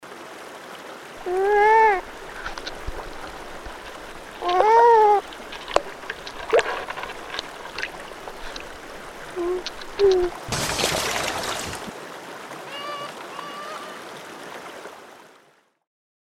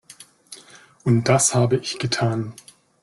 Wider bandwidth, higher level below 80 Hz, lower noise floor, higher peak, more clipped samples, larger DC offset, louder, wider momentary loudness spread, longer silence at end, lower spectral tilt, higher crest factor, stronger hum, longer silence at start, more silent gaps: first, 16.5 kHz vs 12.5 kHz; first, -46 dBFS vs -54 dBFS; first, -59 dBFS vs -48 dBFS; first, 0 dBFS vs -4 dBFS; neither; neither; about the same, -22 LUFS vs -20 LUFS; second, 21 LU vs 24 LU; first, 1 s vs 0.5 s; second, -3 dB/octave vs -4.5 dB/octave; first, 24 dB vs 18 dB; neither; second, 0 s vs 0.5 s; neither